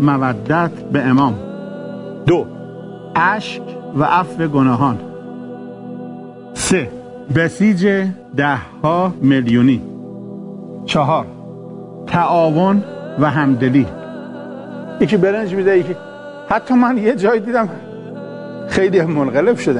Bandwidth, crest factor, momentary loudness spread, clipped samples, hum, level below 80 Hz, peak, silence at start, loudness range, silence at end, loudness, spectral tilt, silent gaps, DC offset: 11 kHz; 16 dB; 17 LU; under 0.1%; none; -50 dBFS; -2 dBFS; 0 s; 3 LU; 0 s; -16 LUFS; -6.5 dB/octave; none; under 0.1%